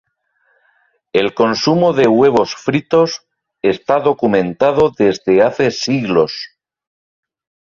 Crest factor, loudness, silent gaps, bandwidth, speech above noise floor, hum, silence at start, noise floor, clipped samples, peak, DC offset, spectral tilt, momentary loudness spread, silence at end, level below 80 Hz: 14 dB; -14 LUFS; none; 7.4 kHz; 49 dB; none; 1.15 s; -62 dBFS; under 0.1%; -2 dBFS; under 0.1%; -5.5 dB/octave; 7 LU; 1.2 s; -52 dBFS